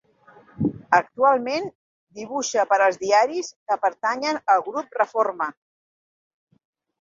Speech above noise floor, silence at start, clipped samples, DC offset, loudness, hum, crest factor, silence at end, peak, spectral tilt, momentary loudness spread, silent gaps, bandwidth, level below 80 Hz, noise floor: 31 dB; 0.6 s; under 0.1%; under 0.1%; -22 LUFS; none; 20 dB; 1.5 s; -2 dBFS; -4 dB/octave; 11 LU; 1.75-2.07 s, 3.56-3.66 s; 7.6 kHz; -62 dBFS; -53 dBFS